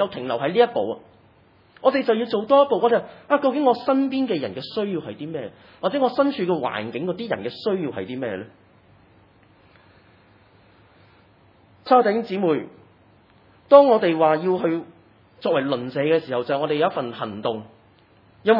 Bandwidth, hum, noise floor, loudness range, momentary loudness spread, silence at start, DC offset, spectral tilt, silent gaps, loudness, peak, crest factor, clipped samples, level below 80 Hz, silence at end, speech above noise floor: 5.6 kHz; none; -55 dBFS; 10 LU; 12 LU; 0 s; under 0.1%; -8.5 dB/octave; none; -21 LUFS; 0 dBFS; 22 dB; under 0.1%; -70 dBFS; 0 s; 34 dB